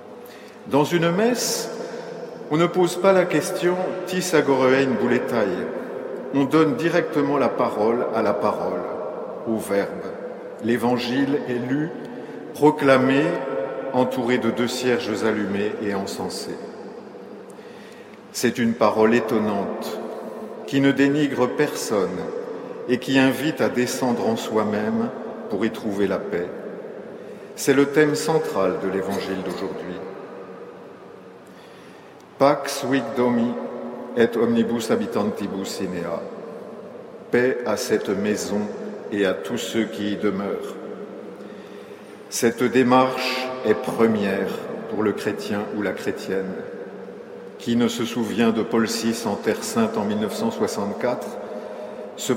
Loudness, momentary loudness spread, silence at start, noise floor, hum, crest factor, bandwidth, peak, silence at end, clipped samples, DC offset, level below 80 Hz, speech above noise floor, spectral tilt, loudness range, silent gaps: -22 LUFS; 18 LU; 0 s; -44 dBFS; none; 20 dB; 16.5 kHz; -2 dBFS; 0 s; under 0.1%; under 0.1%; -66 dBFS; 23 dB; -5 dB/octave; 5 LU; none